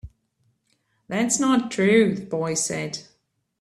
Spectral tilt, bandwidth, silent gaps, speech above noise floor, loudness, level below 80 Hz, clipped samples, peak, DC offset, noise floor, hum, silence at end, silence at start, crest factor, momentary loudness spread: -4 dB/octave; 14 kHz; none; 48 dB; -22 LUFS; -56 dBFS; under 0.1%; -6 dBFS; under 0.1%; -69 dBFS; none; 0.6 s; 0.05 s; 20 dB; 12 LU